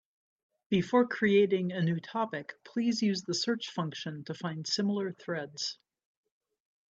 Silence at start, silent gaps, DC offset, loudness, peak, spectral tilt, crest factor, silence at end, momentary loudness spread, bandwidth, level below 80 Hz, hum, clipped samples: 0.7 s; none; under 0.1%; -31 LUFS; -12 dBFS; -5 dB/octave; 20 dB; 1.2 s; 12 LU; 8 kHz; -74 dBFS; none; under 0.1%